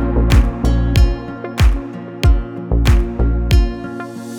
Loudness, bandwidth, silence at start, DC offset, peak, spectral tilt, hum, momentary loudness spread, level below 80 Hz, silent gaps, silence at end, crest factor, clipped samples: -17 LUFS; 15 kHz; 0 s; under 0.1%; -2 dBFS; -6.5 dB/octave; none; 11 LU; -16 dBFS; none; 0 s; 14 dB; under 0.1%